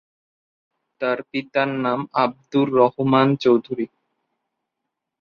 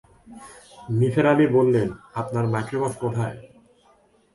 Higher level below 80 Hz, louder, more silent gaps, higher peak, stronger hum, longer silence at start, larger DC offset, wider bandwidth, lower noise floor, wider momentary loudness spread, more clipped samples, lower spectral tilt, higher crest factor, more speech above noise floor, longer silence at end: second, -64 dBFS vs -56 dBFS; about the same, -20 LUFS vs -22 LUFS; neither; about the same, -2 dBFS vs -4 dBFS; neither; first, 1 s vs 0.3 s; neither; second, 6.8 kHz vs 11.5 kHz; first, -81 dBFS vs -59 dBFS; second, 10 LU vs 25 LU; neither; about the same, -8 dB/octave vs -8 dB/octave; about the same, 20 dB vs 20 dB; first, 62 dB vs 37 dB; first, 1.35 s vs 0.9 s